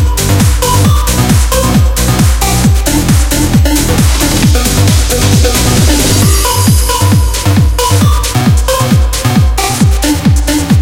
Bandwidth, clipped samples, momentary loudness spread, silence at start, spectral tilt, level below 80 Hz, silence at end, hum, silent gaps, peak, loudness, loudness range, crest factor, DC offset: 17 kHz; 0.3%; 2 LU; 0 s; -4.5 dB/octave; -12 dBFS; 0 s; none; none; 0 dBFS; -9 LUFS; 1 LU; 8 dB; under 0.1%